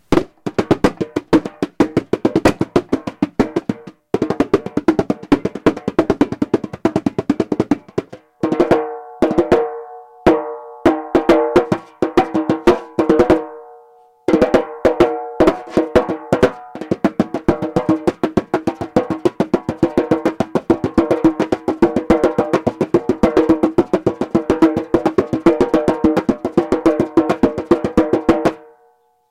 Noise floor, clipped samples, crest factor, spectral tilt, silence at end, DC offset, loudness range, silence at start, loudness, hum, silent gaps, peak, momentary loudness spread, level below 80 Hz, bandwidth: -56 dBFS; under 0.1%; 16 dB; -7 dB/octave; 0.75 s; under 0.1%; 3 LU; 0.1 s; -17 LUFS; none; none; -2 dBFS; 6 LU; -40 dBFS; 12 kHz